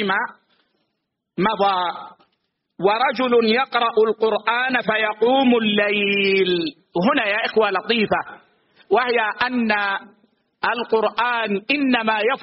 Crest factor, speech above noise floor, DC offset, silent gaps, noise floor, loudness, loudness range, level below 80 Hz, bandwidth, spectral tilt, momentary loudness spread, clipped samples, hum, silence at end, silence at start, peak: 16 dB; 57 dB; under 0.1%; none; -77 dBFS; -19 LUFS; 4 LU; -62 dBFS; 5.8 kHz; -2 dB/octave; 7 LU; under 0.1%; none; 0 s; 0 s; -4 dBFS